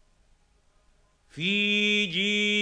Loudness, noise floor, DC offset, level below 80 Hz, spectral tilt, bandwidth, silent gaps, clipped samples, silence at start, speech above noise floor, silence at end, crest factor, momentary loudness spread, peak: -24 LUFS; -64 dBFS; under 0.1%; -64 dBFS; -3.5 dB/octave; 9.6 kHz; none; under 0.1%; 1.35 s; 39 dB; 0 s; 14 dB; 5 LU; -14 dBFS